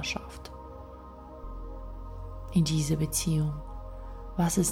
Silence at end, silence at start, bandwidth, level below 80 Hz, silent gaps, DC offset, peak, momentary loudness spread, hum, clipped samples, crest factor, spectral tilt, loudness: 0 s; 0 s; 16.5 kHz; -42 dBFS; none; under 0.1%; -14 dBFS; 19 LU; none; under 0.1%; 18 dB; -5 dB/octave; -29 LUFS